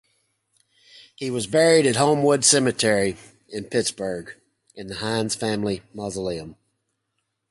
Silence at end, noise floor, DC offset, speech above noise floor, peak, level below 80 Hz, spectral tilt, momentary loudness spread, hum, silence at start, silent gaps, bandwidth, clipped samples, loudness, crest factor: 1 s; -77 dBFS; under 0.1%; 55 dB; -2 dBFS; -56 dBFS; -3.5 dB/octave; 19 LU; none; 1.2 s; none; 11.5 kHz; under 0.1%; -21 LUFS; 22 dB